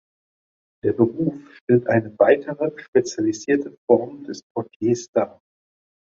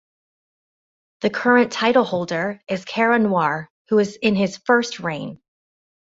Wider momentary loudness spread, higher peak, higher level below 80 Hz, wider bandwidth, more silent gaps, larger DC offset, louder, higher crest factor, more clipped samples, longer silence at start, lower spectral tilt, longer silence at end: about the same, 13 LU vs 11 LU; about the same, -2 dBFS vs -2 dBFS; about the same, -62 dBFS vs -64 dBFS; about the same, 7.8 kHz vs 8 kHz; first, 1.61-1.67 s, 2.88-2.93 s, 3.78-3.88 s, 4.43-4.55 s, 4.76-4.80 s, 5.08-5.13 s vs 3.70-3.85 s; neither; about the same, -21 LUFS vs -20 LUFS; about the same, 20 dB vs 18 dB; neither; second, 0.85 s vs 1.2 s; about the same, -6.5 dB/octave vs -5.5 dB/octave; about the same, 0.75 s vs 0.8 s